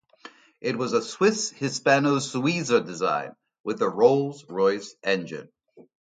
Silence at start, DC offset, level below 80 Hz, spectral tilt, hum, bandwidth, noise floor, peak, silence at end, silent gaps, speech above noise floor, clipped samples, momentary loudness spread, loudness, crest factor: 0.25 s; under 0.1%; -72 dBFS; -4.5 dB/octave; none; 9.4 kHz; -50 dBFS; -6 dBFS; 0.3 s; 3.60-3.64 s; 26 dB; under 0.1%; 12 LU; -24 LUFS; 20 dB